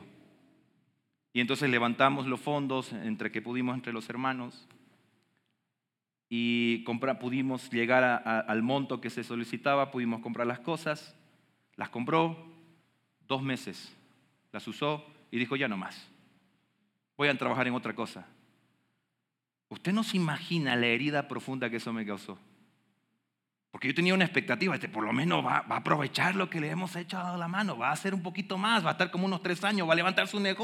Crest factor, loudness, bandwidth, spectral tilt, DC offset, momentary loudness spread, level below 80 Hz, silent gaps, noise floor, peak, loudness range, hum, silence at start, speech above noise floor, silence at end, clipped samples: 24 dB; -30 LUFS; 15 kHz; -5.5 dB/octave; under 0.1%; 12 LU; under -90 dBFS; none; -89 dBFS; -8 dBFS; 6 LU; none; 0 s; 59 dB; 0 s; under 0.1%